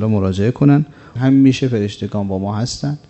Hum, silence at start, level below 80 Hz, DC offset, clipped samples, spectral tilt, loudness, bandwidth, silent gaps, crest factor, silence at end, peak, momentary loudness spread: none; 0 s; -48 dBFS; under 0.1%; under 0.1%; -7.5 dB/octave; -16 LUFS; 8.4 kHz; none; 14 dB; 0.1 s; 0 dBFS; 9 LU